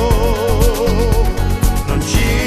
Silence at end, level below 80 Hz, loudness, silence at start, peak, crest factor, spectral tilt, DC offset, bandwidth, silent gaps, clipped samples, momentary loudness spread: 0 s; -16 dBFS; -16 LUFS; 0 s; 0 dBFS; 14 dB; -5.5 dB/octave; under 0.1%; 14 kHz; none; under 0.1%; 3 LU